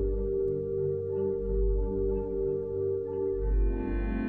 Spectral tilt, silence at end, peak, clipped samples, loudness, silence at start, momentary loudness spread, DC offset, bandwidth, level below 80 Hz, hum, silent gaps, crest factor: -12 dB/octave; 0 s; -18 dBFS; under 0.1%; -31 LUFS; 0 s; 1 LU; 0.1%; 3 kHz; -32 dBFS; none; none; 10 dB